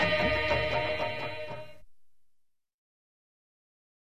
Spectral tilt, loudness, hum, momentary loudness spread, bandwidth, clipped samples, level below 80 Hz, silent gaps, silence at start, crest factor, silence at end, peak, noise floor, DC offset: -5.5 dB/octave; -29 LUFS; none; 14 LU; 13.5 kHz; under 0.1%; -50 dBFS; 2.74-2.79 s; 0 s; 18 dB; 1.35 s; -14 dBFS; -67 dBFS; 0.6%